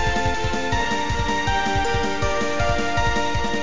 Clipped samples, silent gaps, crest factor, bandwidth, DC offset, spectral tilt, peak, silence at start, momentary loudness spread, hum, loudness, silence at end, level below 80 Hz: under 0.1%; none; 14 dB; 7.6 kHz; 5%; -4.5 dB/octave; -8 dBFS; 0 s; 2 LU; none; -22 LUFS; 0 s; -30 dBFS